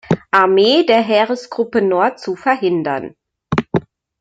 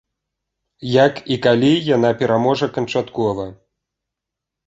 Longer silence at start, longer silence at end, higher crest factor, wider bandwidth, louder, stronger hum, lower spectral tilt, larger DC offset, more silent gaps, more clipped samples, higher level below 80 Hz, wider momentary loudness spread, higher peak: second, 0.1 s vs 0.8 s; second, 0.4 s vs 1.15 s; about the same, 14 dB vs 18 dB; about the same, 7.8 kHz vs 8 kHz; about the same, -16 LUFS vs -17 LUFS; neither; about the same, -6 dB/octave vs -6.5 dB/octave; neither; neither; neither; about the same, -52 dBFS vs -54 dBFS; first, 11 LU vs 8 LU; about the same, -2 dBFS vs 0 dBFS